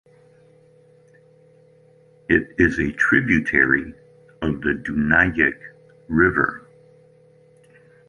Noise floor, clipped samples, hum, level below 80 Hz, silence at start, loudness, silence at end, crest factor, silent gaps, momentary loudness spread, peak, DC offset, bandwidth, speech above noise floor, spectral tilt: -53 dBFS; under 0.1%; none; -42 dBFS; 2.3 s; -19 LUFS; 1.5 s; 20 dB; none; 11 LU; -2 dBFS; under 0.1%; 10.5 kHz; 34 dB; -7 dB/octave